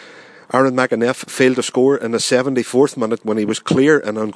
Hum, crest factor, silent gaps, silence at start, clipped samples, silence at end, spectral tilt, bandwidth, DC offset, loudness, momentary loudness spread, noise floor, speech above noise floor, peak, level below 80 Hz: none; 16 dB; none; 0 s; under 0.1%; 0.05 s; -4.5 dB/octave; 11 kHz; under 0.1%; -16 LUFS; 5 LU; -41 dBFS; 25 dB; 0 dBFS; -64 dBFS